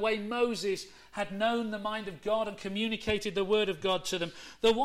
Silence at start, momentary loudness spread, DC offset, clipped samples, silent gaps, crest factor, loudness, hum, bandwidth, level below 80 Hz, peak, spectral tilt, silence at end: 0 s; 8 LU; under 0.1%; under 0.1%; none; 14 dB; -32 LUFS; none; 15 kHz; -56 dBFS; -16 dBFS; -4 dB/octave; 0 s